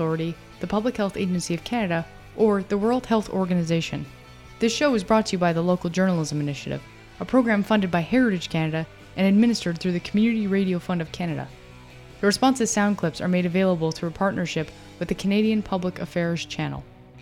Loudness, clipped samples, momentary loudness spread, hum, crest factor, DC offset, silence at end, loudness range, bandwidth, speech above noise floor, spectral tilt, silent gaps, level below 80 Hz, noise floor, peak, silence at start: -24 LUFS; under 0.1%; 10 LU; none; 18 dB; under 0.1%; 0 s; 2 LU; 13.5 kHz; 22 dB; -5.5 dB/octave; none; -50 dBFS; -45 dBFS; -6 dBFS; 0 s